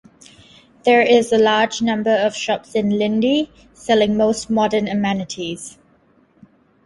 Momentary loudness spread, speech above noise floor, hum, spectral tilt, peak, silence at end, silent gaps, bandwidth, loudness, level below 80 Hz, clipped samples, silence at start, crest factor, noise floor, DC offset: 13 LU; 39 dB; none; -4.5 dB/octave; -2 dBFS; 1.15 s; none; 11.5 kHz; -18 LUFS; -54 dBFS; under 0.1%; 0.85 s; 16 dB; -56 dBFS; under 0.1%